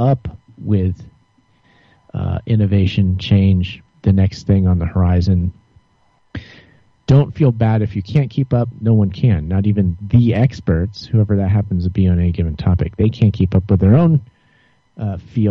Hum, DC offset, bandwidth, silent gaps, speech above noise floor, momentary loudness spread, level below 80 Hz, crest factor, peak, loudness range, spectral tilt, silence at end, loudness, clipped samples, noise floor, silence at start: none; under 0.1%; 6.6 kHz; none; 43 dB; 12 LU; -34 dBFS; 14 dB; -2 dBFS; 3 LU; -9.5 dB/octave; 0 s; -16 LUFS; under 0.1%; -57 dBFS; 0 s